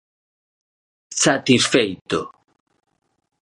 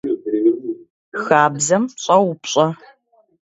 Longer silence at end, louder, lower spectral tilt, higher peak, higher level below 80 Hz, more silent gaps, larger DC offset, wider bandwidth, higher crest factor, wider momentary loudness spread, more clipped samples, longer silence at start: first, 1.15 s vs 0.85 s; about the same, -18 LUFS vs -17 LUFS; about the same, -3 dB/octave vs -4 dB/octave; about the same, -2 dBFS vs 0 dBFS; first, -58 dBFS vs -64 dBFS; second, 2.01-2.05 s vs 0.90-1.12 s; neither; first, 11.5 kHz vs 8 kHz; about the same, 20 dB vs 18 dB; second, 12 LU vs 15 LU; neither; first, 1.1 s vs 0.05 s